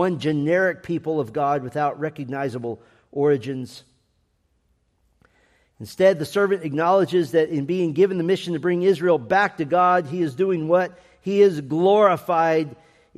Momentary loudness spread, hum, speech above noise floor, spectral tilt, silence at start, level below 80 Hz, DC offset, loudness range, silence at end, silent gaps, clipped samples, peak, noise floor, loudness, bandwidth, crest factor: 12 LU; none; 47 dB; -7 dB/octave; 0 s; -66 dBFS; under 0.1%; 9 LU; 0.45 s; none; under 0.1%; -4 dBFS; -67 dBFS; -21 LUFS; 13.5 kHz; 18 dB